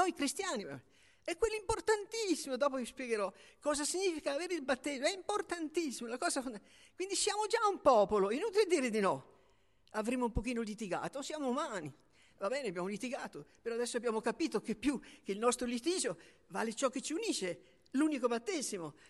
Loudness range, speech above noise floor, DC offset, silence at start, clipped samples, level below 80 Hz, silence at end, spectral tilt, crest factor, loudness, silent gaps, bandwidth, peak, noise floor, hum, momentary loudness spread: 6 LU; 35 dB; under 0.1%; 0 s; under 0.1%; -60 dBFS; 0.15 s; -3.5 dB/octave; 20 dB; -36 LUFS; none; 12 kHz; -16 dBFS; -71 dBFS; none; 11 LU